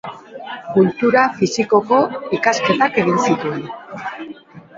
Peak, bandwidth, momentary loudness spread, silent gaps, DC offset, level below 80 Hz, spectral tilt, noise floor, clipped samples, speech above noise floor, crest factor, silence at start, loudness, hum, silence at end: 0 dBFS; 7.8 kHz; 17 LU; none; under 0.1%; -60 dBFS; -5 dB/octave; -38 dBFS; under 0.1%; 21 dB; 18 dB; 0.05 s; -16 LUFS; none; 0.2 s